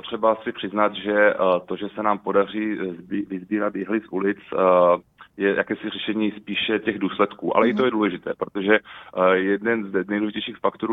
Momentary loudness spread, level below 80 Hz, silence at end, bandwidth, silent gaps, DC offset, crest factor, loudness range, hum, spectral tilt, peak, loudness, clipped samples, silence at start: 8 LU; -62 dBFS; 0 s; 4 kHz; none; under 0.1%; 22 dB; 1 LU; none; -8 dB/octave; 0 dBFS; -22 LUFS; under 0.1%; 0.05 s